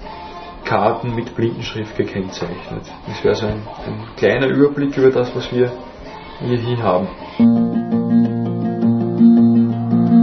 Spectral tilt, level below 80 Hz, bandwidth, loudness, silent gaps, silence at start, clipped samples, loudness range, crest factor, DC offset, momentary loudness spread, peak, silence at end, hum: -8 dB/octave; -44 dBFS; 6.4 kHz; -17 LUFS; none; 0 s; under 0.1%; 6 LU; 16 dB; under 0.1%; 16 LU; 0 dBFS; 0 s; none